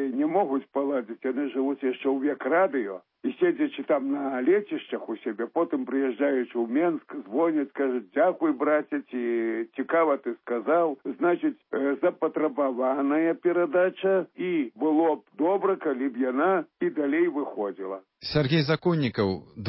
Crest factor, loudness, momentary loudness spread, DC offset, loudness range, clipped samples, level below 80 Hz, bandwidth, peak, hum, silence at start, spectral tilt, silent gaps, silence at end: 16 dB; -26 LUFS; 8 LU; under 0.1%; 2 LU; under 0.1%; -62 dBFS; 5.8 kHz; -10 dBFS; none; 0 s; -11 dB/octave; none; 0 s